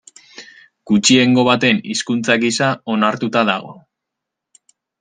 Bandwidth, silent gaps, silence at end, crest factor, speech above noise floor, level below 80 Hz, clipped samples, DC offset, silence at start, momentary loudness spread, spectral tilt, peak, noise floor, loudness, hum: 9.8 kHz; none; 1.3 s; 16 dB; 66 dB; -60 dBFS; under 0.1%; under 0.1%; 0.4 s; 7 LU; -4 dB/octave; 0 dBFS; -81 dBFS; -15 LUFS; none